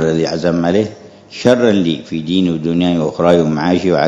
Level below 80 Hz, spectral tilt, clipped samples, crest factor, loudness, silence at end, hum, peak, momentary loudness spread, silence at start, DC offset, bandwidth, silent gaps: -50 dBFS; -6.5 dB/octave; 0.2%; 14 dB; -14 LUFS; 0 s; none; 0 dBFS; 6 LU; 0 s; under 0.1%; 8.2 kHz; none